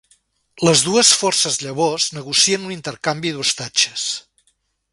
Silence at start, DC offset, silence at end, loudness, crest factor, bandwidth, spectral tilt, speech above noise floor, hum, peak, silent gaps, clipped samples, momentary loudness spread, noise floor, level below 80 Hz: 0.55 s; under 0.1%; 0.75 s; -16 LUFS; 20 dB; 11.5 kHz; -2 dB/octave; 47 dB; none; 0 dBFS; none; under 0.1%; 12 LU; -66 dBFS; -60 dBFS